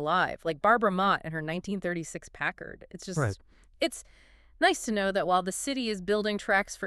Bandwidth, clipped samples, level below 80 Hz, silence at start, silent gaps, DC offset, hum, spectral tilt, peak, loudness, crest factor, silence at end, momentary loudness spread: 13.5 kHz; under 0.1%; -56 dBFS; 0 s; none; under 0.1%; none; -4 dB/octave; -10 dBFS; -29 LUFS; 20 dB; 0 s; 11 LU